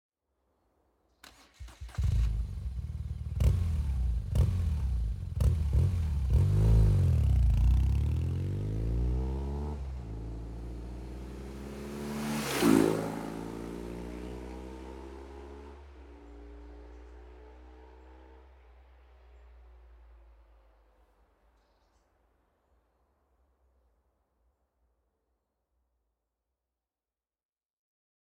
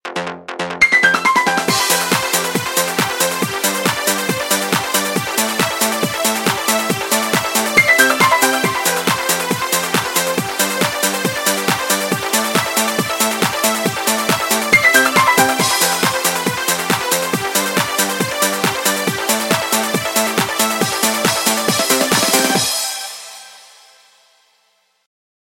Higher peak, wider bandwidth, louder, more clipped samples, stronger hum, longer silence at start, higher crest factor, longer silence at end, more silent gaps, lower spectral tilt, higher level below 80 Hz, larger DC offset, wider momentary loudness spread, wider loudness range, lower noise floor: second, -10 dBFS vs 0 dBFS; about the same, 16.5 kHz vs 17 kHz; second, -31 LUFS vs -15 LUFS; neither; neither; first, 1.6 s vs 0.05 s; first, 22 dB vs 16 dB; first, 8.1 s vs 1.85 s; neither; first, -7 dB/octave vs -2 dB/octave; first, -36 dBFS vs -54 dBFS; neither; first, 24 LU vs 6 LU; first, 20 LU vs 3 LU; first, under -90 dBFS vs -61 dBFS